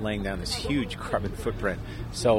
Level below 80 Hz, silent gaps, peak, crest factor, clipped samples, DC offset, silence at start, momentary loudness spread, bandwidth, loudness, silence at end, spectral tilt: -40 dBFS; none; -10 dBFS; 18 dB; under 0.1%; under 0.1%; 0 s; 5 LU; 16 kHz; -30 LUFS; 0 s; -5 dB/octave